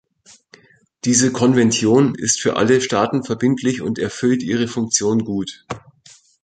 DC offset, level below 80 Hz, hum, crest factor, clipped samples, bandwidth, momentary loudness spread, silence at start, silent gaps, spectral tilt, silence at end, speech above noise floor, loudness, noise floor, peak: under 0.1%; -54 dBFS; none; 16 dB; under 0.1%; 9.4 kHz; 11 LU; 1.05 s; none; -4 dB/octave; 0.65 s; 34 dB; -17 LUFS; -51 dBFS; -2 dBFS